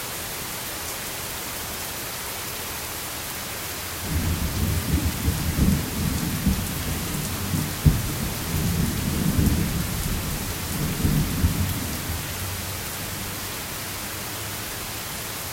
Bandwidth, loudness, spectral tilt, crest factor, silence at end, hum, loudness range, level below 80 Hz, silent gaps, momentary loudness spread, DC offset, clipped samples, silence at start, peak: 16.5 kHz; -26 LUFS; -4 dB/octave; 22 dB; 0 s; none; 5 LU; -34 dBFS; none; 7 LU; under 0.1%; under 0.1%; 0 s; -4 dBFS